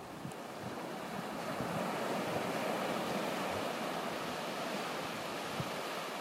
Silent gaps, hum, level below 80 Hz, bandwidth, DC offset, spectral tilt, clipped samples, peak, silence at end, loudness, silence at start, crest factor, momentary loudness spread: none; none; -70 dBFS; 16 kHz; under 0.1%; -4 dB/octave; under 0.1%; -24 dBFS; 0 s; -38 LUFS; 0 s; 16 dB; 6 LU